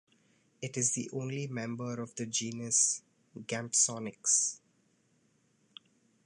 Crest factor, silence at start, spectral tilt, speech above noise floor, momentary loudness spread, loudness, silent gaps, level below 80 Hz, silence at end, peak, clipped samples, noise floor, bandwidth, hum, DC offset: 22 dB; 0.6 s; -2.5 dB/octave; 38 dB; 12 LU; -31 LUFS; none; -80 dBFS; 1.7 s; -14 dBFS; under 0.1%; -71 dBFS; 11.5 kHz; none; under 0.1%